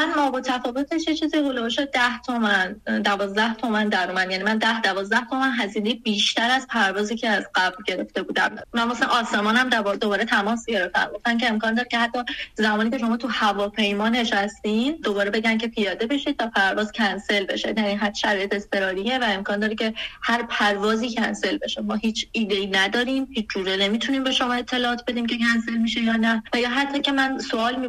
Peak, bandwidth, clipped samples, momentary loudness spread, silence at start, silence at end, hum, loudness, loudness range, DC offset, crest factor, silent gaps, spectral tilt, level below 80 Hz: -4 dBFS; 13 kHz; under 0.1%; 4 LU; 0 s; 0 s; none; -22 LUFS; 2 LU; under 0.1%; 18 dB; none; -3.5 dB/octave; -54 dBFS